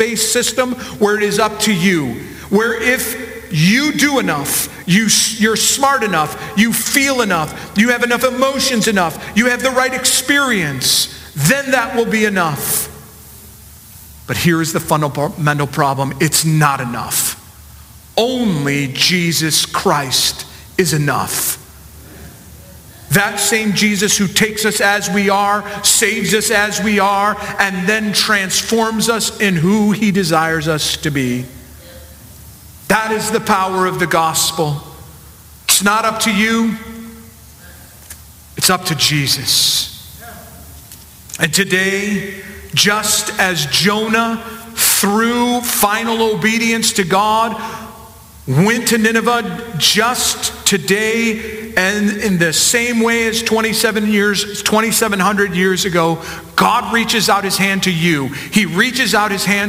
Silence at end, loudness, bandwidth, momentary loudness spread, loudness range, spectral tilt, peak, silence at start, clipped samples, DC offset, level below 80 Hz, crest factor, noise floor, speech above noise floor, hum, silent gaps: 0 s; -14 LUFS; 16 kHz; 8 LU; 4 LU; -3 dB/octave; 0 dBFS; 0 s; under 0.1%; under 0.1%; -44 dBFS; 16 dB; -39 dBFS; 24 dB; none; none